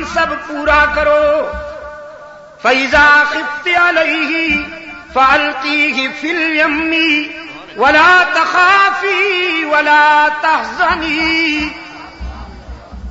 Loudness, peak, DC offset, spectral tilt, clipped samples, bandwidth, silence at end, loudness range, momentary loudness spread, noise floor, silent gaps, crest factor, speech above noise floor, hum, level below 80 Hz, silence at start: -11 LUFS; 0 dBFS; under 0.1%; -0.5 dB/octave; under 0.1%; 8 kHz; 0 s; 3 LU; 21 LU; -35 dBFS; none; 14 dB; 23 dB; none; -36 dBFS; 0 s